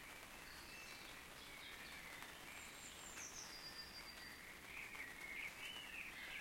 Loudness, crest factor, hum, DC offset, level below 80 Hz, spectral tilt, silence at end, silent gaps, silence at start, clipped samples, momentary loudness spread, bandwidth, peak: -52 LUFS; 22 dB; none; under 0.1%; -70 dBFS; -1 dB/octave; 0 s; none; 0 s; under 0.1%; 6 LU; 16.5 kHz; -32 dBFS